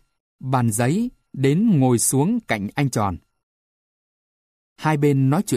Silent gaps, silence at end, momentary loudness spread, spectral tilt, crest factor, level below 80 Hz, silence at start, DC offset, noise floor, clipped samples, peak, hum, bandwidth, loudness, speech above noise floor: 3.43-4.76 s; 0 s; 9 LU; -6 dB/octave; 16 dB; -54 dBFS; 0.45 s; under 0.1%; under -90 dBFS; under 0.1%; -6 dBFS; none; 15.5 kHz; -20 LUFS; over 71 dB